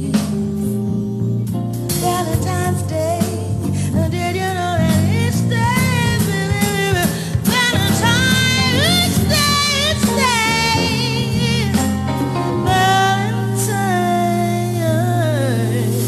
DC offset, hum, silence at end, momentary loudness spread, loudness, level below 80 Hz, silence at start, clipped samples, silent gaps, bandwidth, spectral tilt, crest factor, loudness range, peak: under 0.1%; none; 0 s; 7 LU; -16 LUFS; -40 dBFS; 0 s; under 0.1%; none; 14 kHz; -4.5 dB/octave; 12 dB; 5 LU; -4 dBFS